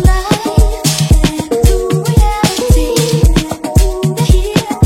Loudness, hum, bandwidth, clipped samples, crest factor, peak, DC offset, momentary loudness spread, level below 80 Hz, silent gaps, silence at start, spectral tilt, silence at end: -12 LUFS; none; 16.5 kHz; under 0.1%; 10 dB; 0 dBFS; under 0.1%; 3 LU; -14 dBFS; none; 0 s; -5.5 dB/octave; 0 s